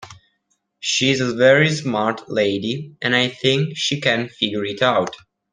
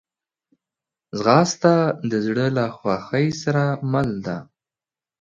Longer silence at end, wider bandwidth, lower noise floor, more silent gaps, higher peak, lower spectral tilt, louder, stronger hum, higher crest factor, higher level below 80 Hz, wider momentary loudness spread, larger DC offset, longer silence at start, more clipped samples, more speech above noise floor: second, 0.35 s vs 0.8 s; first, 10 kHz vs 7.6 kHz; second, -70 dBFS vs under -90 dBFS; neither; about the same, -2 dBFS vs 0 dBFS; second, -4 dB/octave vs -6 dB/octave; about the same, -19 LUFS vs -21 LUFS; neither; about the same, 18 dB vs 22 dB; about the same, -60 dBFS vs -56 dBFS; about the same, 9 LU vs 10 LU; neither; second, 0 s vs 1.15 s; neither; second, 51 dB vs over 70 dB